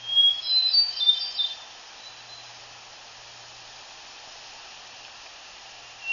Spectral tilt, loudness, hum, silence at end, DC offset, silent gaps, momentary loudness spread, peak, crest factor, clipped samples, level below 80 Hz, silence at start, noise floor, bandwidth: 1.5 dB/octave; -20 LUFS; none; 0 s; under 0.1%; none; 24 LU; -8 dBFS; 20 dB; under 0.1%; -70 dBFS; 0 s; -45 dBFS; 7.4 kHz